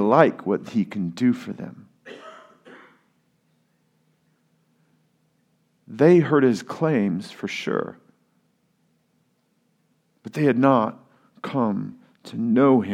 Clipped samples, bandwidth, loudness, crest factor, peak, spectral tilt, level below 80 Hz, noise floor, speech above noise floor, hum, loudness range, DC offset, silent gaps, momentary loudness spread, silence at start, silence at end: under 0.1%; 11 kHz; -21 LUFS; 24 dB; 0 dBFS; -7.5 dB/octave; -76 dBFS; -68 dBFS; 47 dB; none; 9 LU; under 0.1%; none; 23 LU; 0 s; 0 s